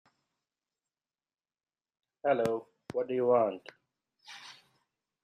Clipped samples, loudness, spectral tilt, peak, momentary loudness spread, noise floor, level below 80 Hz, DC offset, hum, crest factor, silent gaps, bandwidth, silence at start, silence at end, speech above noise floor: under 0.1%; -31 LUFS; -6 dB/octave; -14 dBFS; 21 LU; under -90 dBFS; -78 dBFS; under 0.1%; none; 20 dB; none; 12.5 kHz; 2.25 s; 0.7 s; over 61 dB